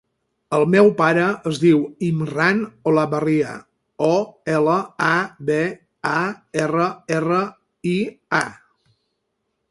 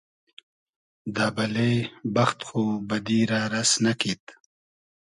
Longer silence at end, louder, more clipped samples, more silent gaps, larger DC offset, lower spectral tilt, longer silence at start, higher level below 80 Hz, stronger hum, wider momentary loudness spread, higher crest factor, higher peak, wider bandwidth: first, 1.15 s vs 0.7 s; first, -20 LUFS vs -25 LUFS; neither; second, none vs 4.20-4.27 s; neither; first, -6.5 dB/octave vs -4 dB/octave; second, 0.5 s vs 1.05 s; about the same, -62 dBFS vs -62 dBFS; neither; about the same, 8 LU vs 7 LU; about the same, 20 dB vs 18 dB; first, -2 dBFS vs -8 dBFS; about the same, 11.5 kHz vs 11.5 kHz